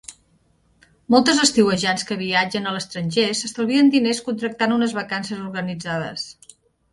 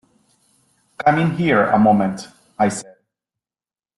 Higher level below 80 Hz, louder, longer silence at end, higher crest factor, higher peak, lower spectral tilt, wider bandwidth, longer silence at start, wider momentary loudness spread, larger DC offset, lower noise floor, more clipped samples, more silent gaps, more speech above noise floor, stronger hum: about the same, -60 dBFS vs -56 dBFS; second, -20 LUFS vs -17 LUFS; second, 0.6 s vs 1.15 s; about the same, 20 dB vs 18 dB; about the same, -2 dBFS vs -4 dBFS; second, -3.5 dB/octave vs -6.5 dB/octave; about the same, 11.5 kHz vs 12 kHz; second, 0.1 s vs 1 s; second, 12 LU vs 17 LU; neither; second, -61 dBFS vs under -90 dBFS; neither; neither; second, 41 dB vs over 74 dB; neither